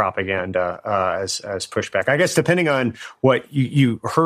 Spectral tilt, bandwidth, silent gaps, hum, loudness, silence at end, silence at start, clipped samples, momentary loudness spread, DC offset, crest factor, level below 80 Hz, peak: -5.5 dB/octave; 15.5 kHz; none; none; -20 LUFS; 0 s; 0 s; under 0.1%; 7 LU; under 0.1%; 18 dB; -58 dBFS; -2 dBFS